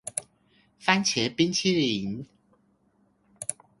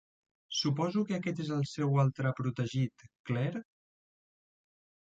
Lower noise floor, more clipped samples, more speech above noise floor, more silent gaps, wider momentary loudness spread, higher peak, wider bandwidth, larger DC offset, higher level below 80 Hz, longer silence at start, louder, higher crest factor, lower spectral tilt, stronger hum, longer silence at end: second, -67 dBFS vs under -90 dBFS; neither; second, 41 dB vs over 58 dB; second, none vs 3.19-3.24 s; first, 13 LU vs 8 LU; first, -6 dBFS vs -18 dBFS; first, 11.5 kHz vs 7.8 kHz; neither; first, -64 dBFS vs -70 dBFS; second, 0.05 s vs 0.5 s; first, -26 LUFS vs -33 LUFS; first, 24 dB vs 16 dB; second, -3.5 dB/octave vs -6 dB/octave; neither; second, 0.3 s vs 1.5 s